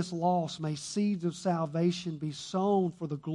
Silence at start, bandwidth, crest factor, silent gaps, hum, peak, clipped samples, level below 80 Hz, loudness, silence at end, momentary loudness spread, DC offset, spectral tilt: 0 s; 11 kHz; 14 dB; none; none; -16 dBFS; under 0.1%; -72 dBFS; -31 LUFS; 0 s; 7 LU; under 0.1%; -6.5 dB/octave